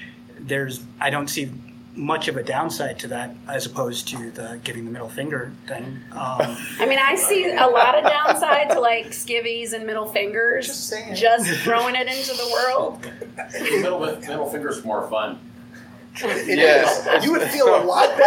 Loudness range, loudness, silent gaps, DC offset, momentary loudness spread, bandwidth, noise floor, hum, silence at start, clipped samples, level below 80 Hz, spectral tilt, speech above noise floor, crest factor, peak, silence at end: 10 LU; -21 LUFS; none; under 0.1%; 16 LU; 19 kHz; -42 dBFS; none; 0 s; under 0.1%; -66 dBFS; -3 dB/octave; 21 dB; 20 dB; -2 dBFS; 0 s